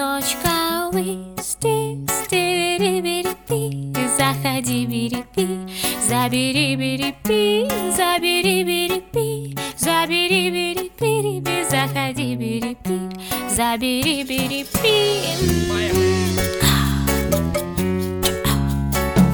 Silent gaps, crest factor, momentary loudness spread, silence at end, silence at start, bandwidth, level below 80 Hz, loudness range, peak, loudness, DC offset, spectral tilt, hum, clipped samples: none; 18 dB; 7 LU; 0 s; 0 s; over 20 kHz; -36 dBFS; 3 LU; -2 dBFS; -20 LUFS; under 0.1%; -4 dB/octave; none; under 0.1%